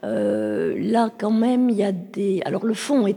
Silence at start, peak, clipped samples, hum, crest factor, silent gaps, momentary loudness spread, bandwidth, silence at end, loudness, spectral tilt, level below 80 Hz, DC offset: 0.05 s; -6 dBFS; under 0.1%; none; 14 dB; none; 5 LU; 12.5 kHz; 0 s; -22 LUFS; -6.5 dB/octave; -70 dBFS; under 0.1%